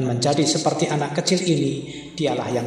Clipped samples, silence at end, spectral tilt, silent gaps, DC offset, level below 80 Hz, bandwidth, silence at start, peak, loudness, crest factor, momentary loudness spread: under 0.1%; 0 s; -4.5 dB/octave; none; under 0.1%; -58 dBFS; 13 kHz; 0 s; -6 dBFS; -21 LUFS; 16 dB; 7 LU